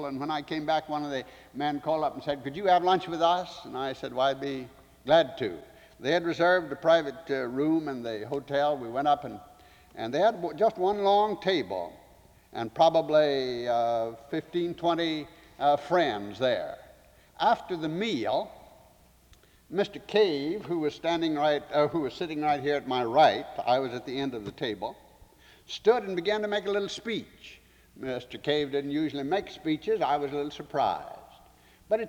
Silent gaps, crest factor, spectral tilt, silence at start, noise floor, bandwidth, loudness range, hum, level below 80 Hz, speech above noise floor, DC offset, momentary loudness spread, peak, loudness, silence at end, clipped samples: none; 18 dB; -5.5 dB/octave; 0 s; -59 dBFS; 19.5 kHz; 4 LU; none; -64 dBFS; 31 dB; under 0.1%; 12 LU; -10 dBFS; -28 LUFS; 0 s; under 0.1%